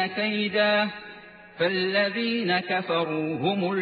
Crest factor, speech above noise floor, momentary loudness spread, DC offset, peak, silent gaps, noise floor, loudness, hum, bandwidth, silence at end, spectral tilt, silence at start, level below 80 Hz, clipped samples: 16 dB; 21 dB; 7 LU; under 0.1%; -10 dBFS; none; -46 dBFS; -25 LUFS; none; 4.9 kHz; 0 s; -8 dB/octave; 0 s; -70 dBFS; under 0.1%